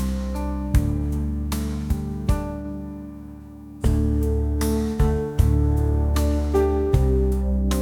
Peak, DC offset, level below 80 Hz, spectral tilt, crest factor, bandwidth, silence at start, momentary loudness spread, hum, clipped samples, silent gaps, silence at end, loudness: -4 dBFS; under 0.1%; -24 dBFS; -7.5 dB/octave; 16 dB; 16.5 kHz; 0 s; 13 LU; none; under 0.1%; none; 0 s; -23 LUFS